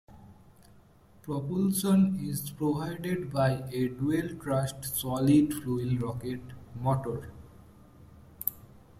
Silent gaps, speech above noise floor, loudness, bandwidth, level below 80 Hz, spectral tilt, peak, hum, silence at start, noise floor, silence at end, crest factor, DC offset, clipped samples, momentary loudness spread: none; 29 dB; -30 LUFS; 16 kHz; -58 dBFS; -6.5 dB/octave; -8 dBFS; none; 0.1 s; -58 dBFS; 0.2 s; 22 dB; under 0.1%; under 0.1%; 13 LU